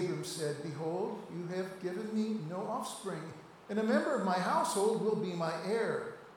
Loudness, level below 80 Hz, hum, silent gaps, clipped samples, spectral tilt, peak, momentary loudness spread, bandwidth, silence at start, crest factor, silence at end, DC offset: -35 LUFS; -78 dBFS; none; none; under 0.1%; -5 dB/octave; -18 dBFS; 9 LU; 18 kHz; 0 s; 18 dB; 0 s; under 0.1%